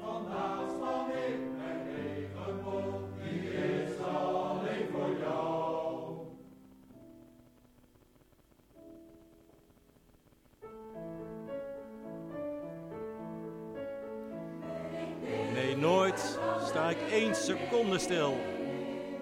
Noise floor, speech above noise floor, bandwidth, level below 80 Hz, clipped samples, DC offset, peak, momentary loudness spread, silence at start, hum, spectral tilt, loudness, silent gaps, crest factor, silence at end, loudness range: -64 dBFS; 33 dB; 16.5 kHz; -68 dBFS; under 0.1%; under 0.1%; -16 dBFS; 16 LU; 0 s; none; -5 dB/octave; -35 LUFS; none; 20 dB; 0 s; 16 LU